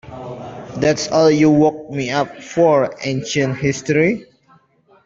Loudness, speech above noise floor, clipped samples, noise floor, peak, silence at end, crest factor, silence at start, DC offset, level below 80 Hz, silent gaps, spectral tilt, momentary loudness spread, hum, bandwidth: -17 LUFS; 38 dB; under 0.1%; -54 dBFS; -2 dBFS; 0.85 s; 16 dB; 0.05 s; under 0.1%; -52 dBFS; none; -5.5 dB/octave; 18 LU; none; 7.8 kHz